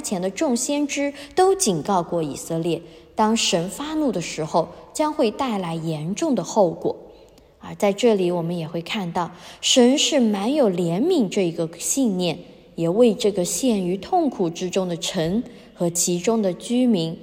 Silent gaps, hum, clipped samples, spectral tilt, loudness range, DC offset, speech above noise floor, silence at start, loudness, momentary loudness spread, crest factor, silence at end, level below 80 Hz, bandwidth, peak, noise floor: none; none; under 0.1%; -4 dB/octave; 4 LU; under 0.1%; 28 dB; 0 s; -22 LUFS; 9 LU; 18 dB; 0 s; -56 dBFS; 16 kHz; -4 dBFS; -49 dBFS